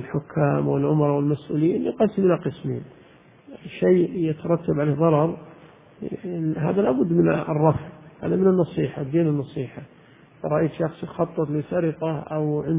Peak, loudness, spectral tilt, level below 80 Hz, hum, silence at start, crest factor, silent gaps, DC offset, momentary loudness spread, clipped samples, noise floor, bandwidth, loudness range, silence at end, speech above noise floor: -4 dBFS; -23 LUFS; -12.5 dB/octave; -54 dBFS; none; 0 s; 20 dB; none; under 0.1%; 13 LU; under 0.1%; -50 dBFS; 3.9 kHz; 4 LU; 0 s; 27 dB